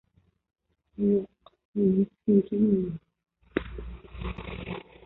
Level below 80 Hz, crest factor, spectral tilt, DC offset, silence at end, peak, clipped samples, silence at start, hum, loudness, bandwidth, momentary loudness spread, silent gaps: -46 dBFS; 20 dB; -12 dB/octave; under 0.1%; 0.25 s; -10 dBFS; under 0.1%; 1 s; none; -28 LUFS; 4.1 kHz; 19 LU; 1.65-1.73 s